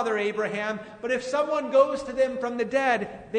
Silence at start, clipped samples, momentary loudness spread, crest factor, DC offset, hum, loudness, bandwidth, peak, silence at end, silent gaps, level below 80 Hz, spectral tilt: 0 s; under 0.1%; 8 LU; 18 dB; under 0.1%; none; -26 LUFS; 9.6 kHz; -8 dBFS; 0 s; none; -62 dBFS; -4.5 dB/octave